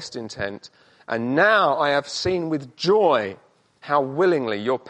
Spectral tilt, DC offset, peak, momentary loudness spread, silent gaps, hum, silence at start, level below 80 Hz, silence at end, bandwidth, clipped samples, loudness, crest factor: -5 dB/octave; under 0.1%; -4 dBFS; 13 LU; none; none; 0 s; -58 dBFS; 0 s; 9.8 kHz; under 0.1%; -21 LUFS; 18 dB